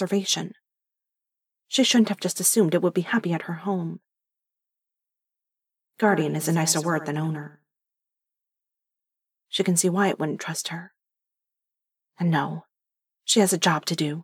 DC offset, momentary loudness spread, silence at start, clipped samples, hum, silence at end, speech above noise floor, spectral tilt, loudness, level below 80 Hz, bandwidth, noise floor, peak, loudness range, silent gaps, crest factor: under 0.1%; 13 LU; 0 s; under 0.1%; none; 0 s; 64 dB; -4 dB/octave; -23 LUFS; -84 dBFS; 17.5 kHz; -87 dBFS; -6 dBFS; 6 LU; none; 20 dB